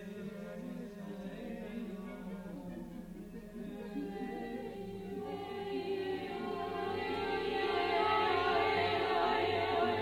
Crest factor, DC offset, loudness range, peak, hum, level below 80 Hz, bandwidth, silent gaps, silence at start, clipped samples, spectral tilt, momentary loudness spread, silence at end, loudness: 16 dB; under 0.1%; 12 LU; -20 dBFS; none; -60 dBFS; 16.5 kHz; none; 0 s; under 0.1%; -6 dB/octave; 15 LU; 0 s; -37 LUFS